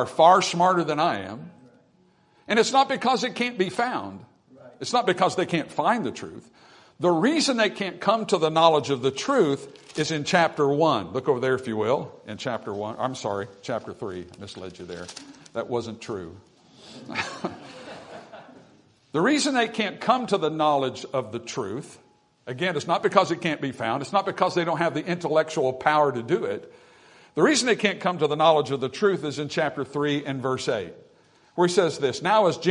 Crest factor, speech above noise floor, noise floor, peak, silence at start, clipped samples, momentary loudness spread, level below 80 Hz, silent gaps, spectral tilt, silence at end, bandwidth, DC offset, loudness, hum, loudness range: 22 dB; 37 dB; -61 dBFS; -2 dBFS; 0 s; under 0.1%; 16 LU; -70 dBFS; none; -4.5 dB/octave; 0 s; 11 kHz; under 0.1%; -24 LUFS; none; 11 LU